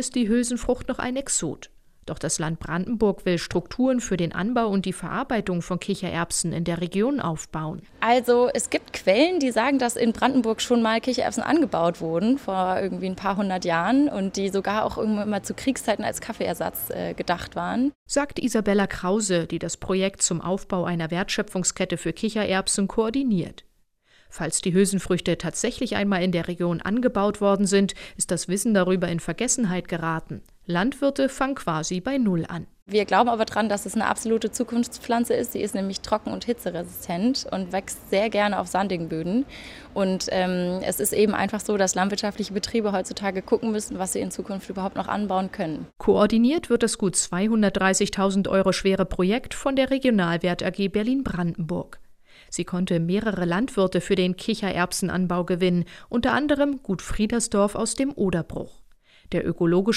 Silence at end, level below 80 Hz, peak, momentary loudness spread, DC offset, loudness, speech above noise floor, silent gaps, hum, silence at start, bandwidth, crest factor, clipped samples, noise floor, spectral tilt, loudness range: 0 s; -48 dBFS; -4 dBFS; 8 LU; under 0.1%; -24 LUFS; 38 dB; 17.95-18.06 s, 32.82-32.86 s; none; 0 s; 16 kHz; 18 dB; under 0.1%; -61 dBFS; -4.5 dB/octave; 4 LU